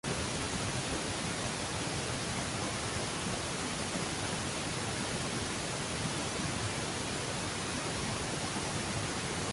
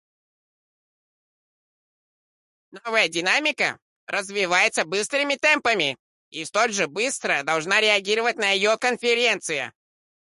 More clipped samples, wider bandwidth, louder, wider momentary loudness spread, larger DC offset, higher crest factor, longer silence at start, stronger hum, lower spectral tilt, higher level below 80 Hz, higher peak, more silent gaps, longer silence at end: neither; about the same, 12 kHz vs 11.5 kHz; second, -35 LUFS vs -21 LUFS; second, 1 LU vs 10 LU; neither; second, 14 dB vs 20 dB; second, 0.05 s vs 2.75 s; neither; first, -3 dB/octave vs -1.5 dB/octave; first, -50 dBFS vs -72 dBFS; second, -22 dBFS vs -6 dBFS; second, none vs 3.82-4.07 s, 5.99-6.32 s; second, 0 s vs 0.55 s